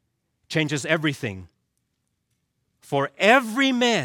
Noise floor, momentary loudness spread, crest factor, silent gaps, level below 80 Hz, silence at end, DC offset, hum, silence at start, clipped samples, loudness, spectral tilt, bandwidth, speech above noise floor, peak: -75 dBFS; 14 LU; 22 dB; none; -68 dBFS; 0 s; under 0.1%; none; 0.5 s; under 0.1%; -22 LUFS; -4.5 dB/octave; 17.5 kHz; 54 dB; -4 dBFS